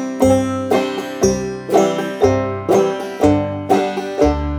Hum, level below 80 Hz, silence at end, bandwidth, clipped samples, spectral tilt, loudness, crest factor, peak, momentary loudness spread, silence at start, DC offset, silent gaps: none; -34 dBFS; 0 s; 18 kHz; under 0.1%; -6 dB/octave; -17 LUFS; 16 dB; 0 dBFS; 5 LU; 0 s; under 0.1%; none